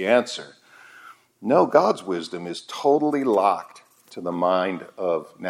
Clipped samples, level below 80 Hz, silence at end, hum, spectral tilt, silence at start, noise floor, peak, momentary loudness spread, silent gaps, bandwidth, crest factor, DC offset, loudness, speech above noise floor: under 0.1%; -78 dBFS; 0 s; none; -5.5 dB/octave; 0 s; -48 dBFS; -2 dBFS; 14 LU; none; 14.5 kHz; 20 dB; under 0.1%; -22 LUFS; 26 dB